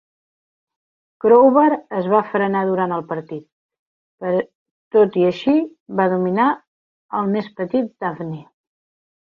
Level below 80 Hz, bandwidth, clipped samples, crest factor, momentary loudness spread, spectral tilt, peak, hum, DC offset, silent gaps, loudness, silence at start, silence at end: -66 dBFS; 6.6 kHz; under 0.1%; 18 dB; 16 LU; -9 dB/octave; -2 dBFS; none; under 0.1%; 3.52-3.69 s, 3.79-4.18 s, 4.55-4.91 s, 5.80-5.86 s, 6.67-7.09 s; -18 LUFS; 1.25 s; 0.85 s